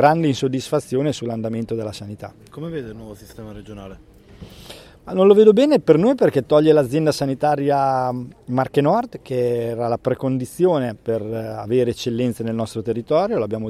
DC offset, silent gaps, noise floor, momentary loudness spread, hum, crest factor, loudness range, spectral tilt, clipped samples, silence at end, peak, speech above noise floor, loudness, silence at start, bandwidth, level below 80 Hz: under 0.1%; none; -42 dBFS; 22 LU; none; 18 dB; 14 LU; -7 dB/octave; under 0.1%; 0 s; 0 dBFS; 23 dB; -19 LUFS; 0 s; 14 kHz; -52 dBFS